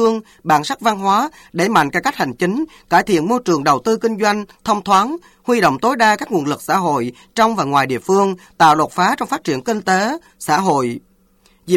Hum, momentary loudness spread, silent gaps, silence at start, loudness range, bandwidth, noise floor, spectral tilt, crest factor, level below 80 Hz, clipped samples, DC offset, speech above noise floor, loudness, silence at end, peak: none; 7 LU; none; 0 s; 1 LU; 17 kHz; -55 dBFS; -4.5 dB/octave; 14 dB; -54 dBFS; under 0.1%; under 0.1%; 38 dB; -17 LUFS; 0 s; -2 dBFS